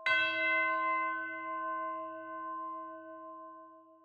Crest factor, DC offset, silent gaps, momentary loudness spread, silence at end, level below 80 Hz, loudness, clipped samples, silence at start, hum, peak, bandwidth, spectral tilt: 18 dB; under 0.1%; none; 19 LU; 0.1 s; -86 dBFS; -34 LUFS; under 0.1%; 0 s; none; -18 dBFS; 8.4 kHz; -3 dB/octave